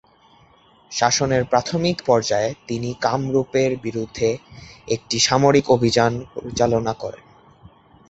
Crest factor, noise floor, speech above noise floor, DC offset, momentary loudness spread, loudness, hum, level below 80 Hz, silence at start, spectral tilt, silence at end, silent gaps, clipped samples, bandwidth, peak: 20 dB; -53 dBFS; 33 dB; under 0.1%; 13 LU; -20 LUFS; none; -50 dBFS; 0.9 s; -4.5 dB/octave; 0.95 s; none; under 0.1%; 8.2 kHz; -2 dBFS